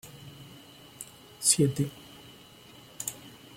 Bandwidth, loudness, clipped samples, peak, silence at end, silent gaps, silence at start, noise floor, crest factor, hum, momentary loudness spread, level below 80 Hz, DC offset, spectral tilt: 16.5 kHz; -27 LUFS; under 0.1%; -6 dBFS; 0.3 s; none; 0.05 s; -52 dBFS; 26 dB; none; 27 LU; -64 dBFS; under 0.1%; -4 dB/octave